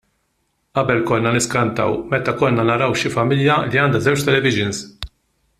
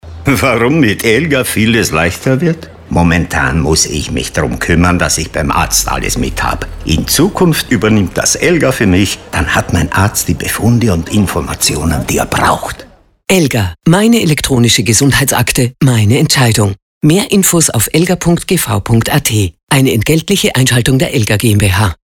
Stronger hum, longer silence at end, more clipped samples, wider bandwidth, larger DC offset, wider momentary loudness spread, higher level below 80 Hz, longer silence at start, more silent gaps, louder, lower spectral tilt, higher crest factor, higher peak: neither; first, 0.55 s vs 0.1 s; neither; second, 15 kHz vs 18.5 kHz; neither; about the same, 8 LU vs 6 LU; second, -48 dBFS vs -28 dBFS; first, 0.75 s vs 0.05 s; second, none vs 16.82-17.01 s, 19.63-19.67 s; second, -18 LUFS vs -11 LUFS; about the same, -5 dB/octave vs -4.5 dB/octave; first, 18 dB vs 10 dB; about the same, 0 dBFS vs 0 dBFS